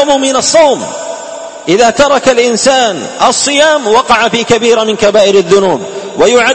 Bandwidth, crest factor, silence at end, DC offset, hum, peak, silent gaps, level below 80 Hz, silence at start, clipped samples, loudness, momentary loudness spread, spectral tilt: 11 kHz; 8 dB; 0 s; 0.5%; none; 0 dBFS; none; -44 dBFS; 0 s; 1%; -8 LUFS; 12 LU; -2.5 dB/octave